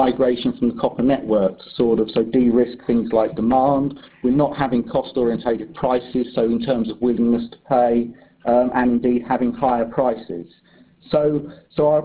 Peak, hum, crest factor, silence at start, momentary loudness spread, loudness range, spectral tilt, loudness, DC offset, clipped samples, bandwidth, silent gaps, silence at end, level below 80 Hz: -4 dBFS; none; 16 dB; 0 s; 6 LU; 2 LU; -11 dB/octave; -20 LUFS; under 0.1%; under 0.1%; 4 kHz; none; 0 s; -48 dBFS